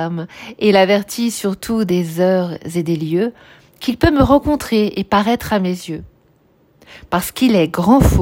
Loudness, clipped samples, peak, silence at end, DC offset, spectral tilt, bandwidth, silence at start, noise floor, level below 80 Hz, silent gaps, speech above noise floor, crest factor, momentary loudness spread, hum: -16 LUFS; under 0.1%; 0 dBFS; 0 s; under 0.1%; -6 dB/octave; 16.5 kHz; 0 s; -54 dBFS; -32 dBFS; none; 39 dB; 16 dB; 11 LU; none